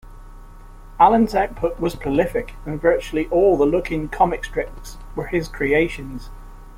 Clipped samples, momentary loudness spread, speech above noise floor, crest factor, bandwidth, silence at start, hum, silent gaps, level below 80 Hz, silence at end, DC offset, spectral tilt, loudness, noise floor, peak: under 0.1%; 16 LU; 20 dB; 18 dB; 16.5 kHz; 0.05 s; none; none; -36 dBFS; 0 s; under 0.1%; -6.5 dB/octave; -20 LUFS; -40 dBFS; -2 dBFS